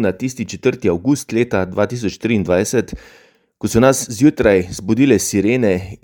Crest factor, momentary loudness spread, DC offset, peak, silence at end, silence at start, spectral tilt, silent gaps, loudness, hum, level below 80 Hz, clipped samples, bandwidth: 16 dB; 8 LU; under 0.1%; 0 dBFS; 0.1 s; 0 s; -5.5 dB/octave; none; -16 LUFS; none; -42 dBFS; under 0.1%; 18 kHz